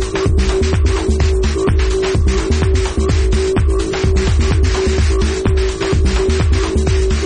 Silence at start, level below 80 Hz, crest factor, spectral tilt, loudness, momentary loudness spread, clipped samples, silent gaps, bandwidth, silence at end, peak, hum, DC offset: 0 s; -16 dBFS; 10 dB; -6 dB/octave; -15 LUFS; 1 LU; under 0.1%; none; 10 kHz; 0 s; -4 dBFS; none; under 0.1%